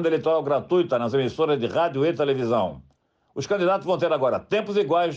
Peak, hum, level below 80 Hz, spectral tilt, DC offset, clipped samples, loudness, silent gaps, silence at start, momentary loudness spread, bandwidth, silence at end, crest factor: -12 dBFS; none; -62 dBFS; -6.5 dB/octave; under 0.1%; under 0.1%; -23 LUFS; none; 0 s; 3 LU; 7.8 kHz; 0 s; 10 dB